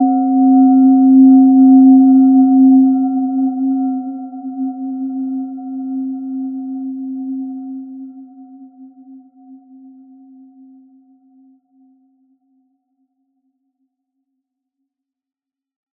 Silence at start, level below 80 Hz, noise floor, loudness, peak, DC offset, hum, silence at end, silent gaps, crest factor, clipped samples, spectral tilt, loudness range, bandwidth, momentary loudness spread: 0 s; -78 dBFS; -80 dBFS; -12 LUFS; -2 dBFS; under 0.1%; none; 6.45 s; none; 14 dB; under 0.1%; -14.5 dB/octave; 21 LU; 1.4 kHz; 19 LU